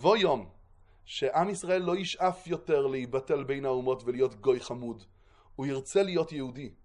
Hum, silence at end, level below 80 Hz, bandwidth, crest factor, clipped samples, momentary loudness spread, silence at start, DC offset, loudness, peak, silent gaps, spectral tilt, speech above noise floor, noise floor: none; 0.15 s; -62 dBFS; 11 kHz; 20 dB; under 0.1%; 11 LU; 0 s; under 0.1%; -30 LUFS; -10 dBFS; none; -5 dB/octave; 28 dB; -57 dBFS